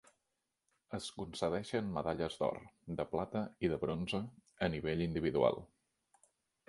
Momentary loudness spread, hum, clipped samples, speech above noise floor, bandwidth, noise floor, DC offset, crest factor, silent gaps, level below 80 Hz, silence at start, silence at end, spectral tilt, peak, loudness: 11 LU; none; under 0.1%; 49 dB; 11.5 kHz; -87 dBFS; under 0.1%; 22 dB; none; -60 dBFS; 0.9 s; 1.05 s; -6 dB/octave; -16 dBFS; -38 LUFS